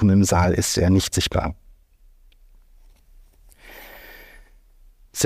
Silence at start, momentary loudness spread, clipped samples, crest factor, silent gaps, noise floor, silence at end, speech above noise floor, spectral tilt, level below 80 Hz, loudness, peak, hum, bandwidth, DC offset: 0 s; 26 LU; under 0.1%; 18 dB; none; -53 dBFS; 0 s; 34 dB; -5 dB/octave; -38 dBFS; -20 LUFS; -6 dBFS; none; 15.5 kHz; under 0.1%